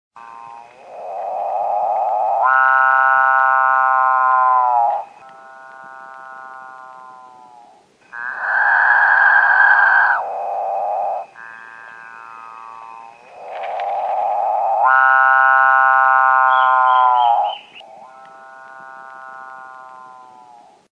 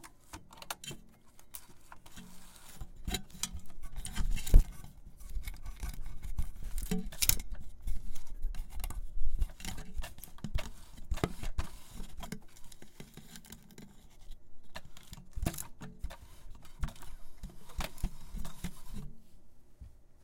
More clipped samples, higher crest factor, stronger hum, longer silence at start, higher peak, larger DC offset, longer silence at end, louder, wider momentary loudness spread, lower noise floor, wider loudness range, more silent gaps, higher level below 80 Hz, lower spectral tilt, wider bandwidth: neither; second, 16 dB vs 28 dB; neither; first, 0.15 s vs 0 s; first, -2 dBFS vs -6 dBFS; neither; first, 0.8 s vs 0.1 s; first, -14 LUFS vs -40 LUFS; first, 25 LU vs 17 LU; second, -49 dBFS vs -54 dBFS; first, 14 LU vs 10 LU; neither; second, -80 dBFS vs -38 dBFS; second, -1.5 dB/octave vs -3.5 dB/octave; second, 7.4 kHz vs 17 kHz